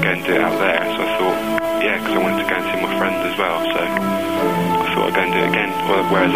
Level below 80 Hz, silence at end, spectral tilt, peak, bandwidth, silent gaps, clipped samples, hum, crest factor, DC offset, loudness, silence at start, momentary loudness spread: -52 dBFS; 0 s; -5 dB/octave; -2 dBFS; 16 kHz; none; under 0.1%; none; 16 dB; 0.6%; -18 LUFS; 0 s; 3 LU